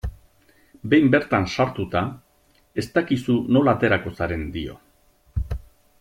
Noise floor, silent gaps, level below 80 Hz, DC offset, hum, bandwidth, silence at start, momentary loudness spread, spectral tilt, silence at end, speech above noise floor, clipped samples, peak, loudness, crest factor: -60 dBFS; none; -40 dBFS; under 0.1%; none; 14.5 kHz; 0.05 s; 15 LU; -7 dB/octave; 0.45 s; 39 dB; under 0.1%; -4 dBFS; -22 LUFS; 20 dB